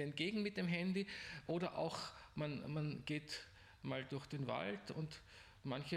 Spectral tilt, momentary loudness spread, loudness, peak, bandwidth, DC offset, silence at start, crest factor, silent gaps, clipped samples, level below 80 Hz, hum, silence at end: -6 dB/octave; 10 LU; -44 LUFS; -26 dBFS; 14 kHz; under 0.1%; 0 s; 18 dB; none; under 0.1%; -70 dBFS; none; 0 s